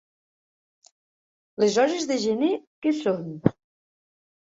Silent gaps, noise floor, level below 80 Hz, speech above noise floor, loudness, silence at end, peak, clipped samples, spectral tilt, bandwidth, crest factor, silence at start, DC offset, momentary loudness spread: 2.67-2.82 s; under -90 dBFS; -64 dBFS; over 66 dB; -24 LUFS; 1 s; -2 dBFS; under 0.1%; -5.5 dB/octave; 8 kHz; 26 dB; 1.6 s; under 0.1%; 6 LU